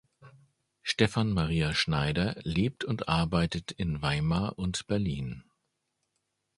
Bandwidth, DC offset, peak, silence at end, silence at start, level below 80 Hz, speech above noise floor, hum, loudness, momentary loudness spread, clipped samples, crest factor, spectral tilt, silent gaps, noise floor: 11.5 kHz; under 0.1%; -8 dBFS; 1.2 s; 0.2 s; -46 dBFS; 51 dB; none; -30 LUFS; 7 LU; under 0.1%; 24 dB; -5.5 dB/octave; none; -80 dBFS